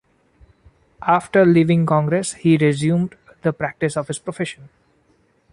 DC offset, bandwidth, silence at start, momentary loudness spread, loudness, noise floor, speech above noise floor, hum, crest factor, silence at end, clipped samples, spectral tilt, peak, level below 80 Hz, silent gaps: under 0.1%; 11 kHz; 1 s; 13 LU; -19 LUFS; -60 dBFS; 43 dB; none; 16 dB; 0.85 s; under 0.1%; -6.5 dB/octave; -2 dBFS; -56 dBFS; none